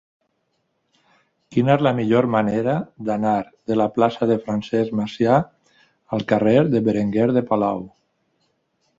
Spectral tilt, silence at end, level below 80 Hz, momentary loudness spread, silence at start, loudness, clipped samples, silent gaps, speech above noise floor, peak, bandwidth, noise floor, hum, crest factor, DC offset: -8 dB/octave; 1.1 s; -58 dBFS; 8 LU; 1.5 s; -20 LUFS; under 0.1%; none; 52 dB; -2 dBFS; 7.8 kHz; -71 dBFS; none; 18 dB; under 0.1%